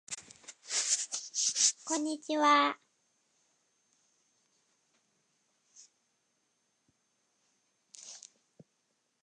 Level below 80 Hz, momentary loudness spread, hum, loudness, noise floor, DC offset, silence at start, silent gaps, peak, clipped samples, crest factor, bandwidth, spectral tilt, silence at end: under -90 dBFS; 24 LU; none; -29 LUFS; -79 dBFS; under 0.1%; 0.1 s; none; -12 dBFS; under 0.1%; 24 dB; 11 kHz; 1 dB/octave; 1.05 s